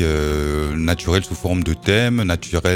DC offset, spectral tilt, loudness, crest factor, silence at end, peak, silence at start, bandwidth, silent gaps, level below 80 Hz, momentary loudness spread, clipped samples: under 0.1%; -5.5 dB/octave; -19 LUFS; 18 dB; 0 s; -2 dBFS; 0 s; 16.5 kHz; none; -28 dBFS; 5 LU; under 0.1%